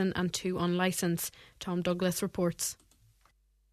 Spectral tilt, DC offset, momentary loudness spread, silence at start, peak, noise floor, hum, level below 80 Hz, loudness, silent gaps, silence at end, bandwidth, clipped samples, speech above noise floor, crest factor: -4.5 dB/octave; under 0.1%; 8 LU; 0 s; -14 dBFS; -68 dBFS; none; -60 dBFS; -32 LUFS; none; 1 s; 14 kHz; under 0.1%; 36 dB; 18 dB